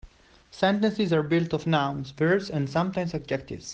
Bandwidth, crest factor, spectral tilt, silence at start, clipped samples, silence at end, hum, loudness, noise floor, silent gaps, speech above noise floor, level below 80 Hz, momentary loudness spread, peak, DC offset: 8.4 kHz; 16 dB; -6.5 dB/octave; 0.05 s; under 0.1%; 0 s; none; -26 LUFS; -54 dBFS; none; 29 dB; -54 dBFS; 7 LU; -10 dBFS; under 0.1%